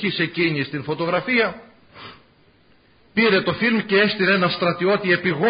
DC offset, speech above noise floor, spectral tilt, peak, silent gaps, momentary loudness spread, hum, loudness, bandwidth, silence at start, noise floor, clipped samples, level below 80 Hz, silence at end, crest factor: under 0.1%; 36 dB; -10.5 dB/octave; -4 dBFS; none; 8 LU; none; -19 LUFS; 5.2 kHz; 0 s; -55 dBFS; under 0.1%; -58 dBFS; 0 s; 16 dB